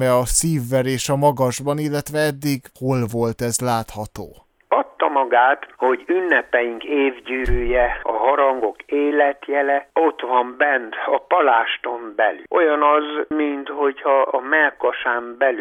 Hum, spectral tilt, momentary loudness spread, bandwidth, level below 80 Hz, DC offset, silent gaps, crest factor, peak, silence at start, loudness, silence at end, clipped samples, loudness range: none; -4.5 dB/octave; 7 LU; 19 kHz; -38 dBFS; under 0.1%; none; 16 dB; -4 dBFS; 0 s; -19 LUFS; 0 s; under 0.1%; 3 LU